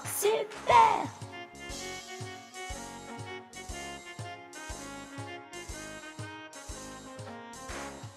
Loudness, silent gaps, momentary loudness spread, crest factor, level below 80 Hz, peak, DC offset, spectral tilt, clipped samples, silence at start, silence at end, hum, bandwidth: -33 LUFS; none; 18 LU; 26 dB; -54 dBFS; -8 dBFS; under 0.1%; -3 dB/octave; under 0.1%; 0 s; 0 s; none; 15.5 kHz